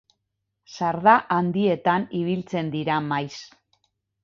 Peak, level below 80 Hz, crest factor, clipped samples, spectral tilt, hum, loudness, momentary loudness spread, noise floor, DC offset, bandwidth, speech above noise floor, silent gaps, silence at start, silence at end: -2 dBFS; -64 dBFS; 22 dB; under 0.1%; -6.5 dB/octave; none; -23 LUFS; 11 LU; -79 dBFS; under 0.1%; 7.4 kHz; 57 dB; none; 0.7 s; 0.8 s